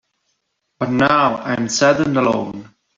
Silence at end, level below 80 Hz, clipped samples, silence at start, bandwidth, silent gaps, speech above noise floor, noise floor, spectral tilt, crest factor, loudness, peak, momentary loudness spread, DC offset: 0.35 s; -54 dBFS; under 0.1%; 0.8 s; 7.8 kHz; none; 55 dB; -71 dBFS; -4.5 dB/octave; 16 dB; -17 LUFS; -2 dBFS; 12 LU; under 0.1%